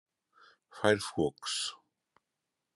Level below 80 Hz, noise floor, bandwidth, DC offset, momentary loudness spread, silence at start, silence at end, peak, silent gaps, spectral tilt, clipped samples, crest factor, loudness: -70 dBFS; -87 dBFS; 12 kHz; under 0.1%; 6 LU; 0.75 s; 1 s; -10 dBFS; none; -3.5 dB/octave; under 0.1%; 26 dB; -32 LUFS